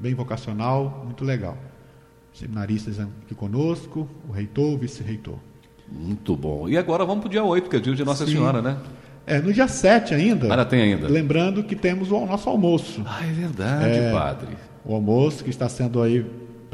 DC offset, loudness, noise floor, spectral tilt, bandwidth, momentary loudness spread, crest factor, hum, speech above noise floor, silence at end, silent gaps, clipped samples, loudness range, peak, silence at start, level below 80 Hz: under 0.1%; -23 LUFS; -50 dBFS; -6.5 dB/octave; 12 kHz; 15 LU; 20 dB; none; 28 dB; 0.05 s; none; under 0.1%; 9 LU; -4 dBFS; 0 s; -48 dBFS